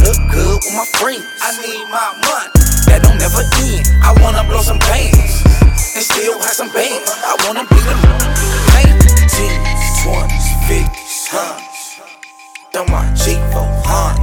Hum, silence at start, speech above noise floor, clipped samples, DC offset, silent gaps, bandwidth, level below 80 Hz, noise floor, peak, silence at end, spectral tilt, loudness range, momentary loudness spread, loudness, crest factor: none; 0 s; 17 dB; 2%; under 0.1%; none; 19.5 kHz; -12 dBFS; -36 dBFS; 0 dBFS; 0 s; -4 dB/octave; 7 LU; 10 LU; -12 LUFS; 10 dB